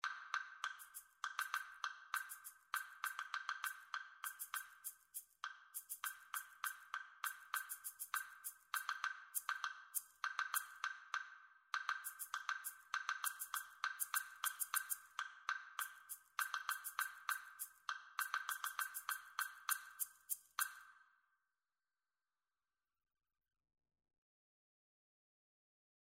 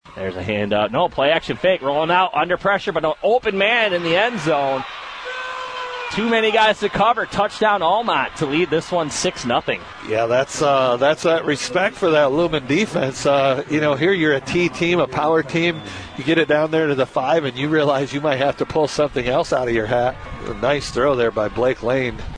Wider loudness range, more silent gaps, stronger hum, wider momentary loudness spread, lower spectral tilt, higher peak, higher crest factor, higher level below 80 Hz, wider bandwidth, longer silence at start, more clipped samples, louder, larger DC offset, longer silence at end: first, 5 LU vs 2 LU; neither; neither; about the same, 8 LU vs 7 LU; second, 5.5 dB/octave vs -4.5 dB/octave; second, -22 dBFS vs -4 dBFS; first, 26 dB vs 16 dB; second, under -90 dBFS vs -46 dBFS; first, 16 kHz vs 10.5 kHz; about the same, 0.05 s vs 0.05 s; neither; second, -45 LUFS vs -19 LUFS; neither; first, 4.95 s vs 0 s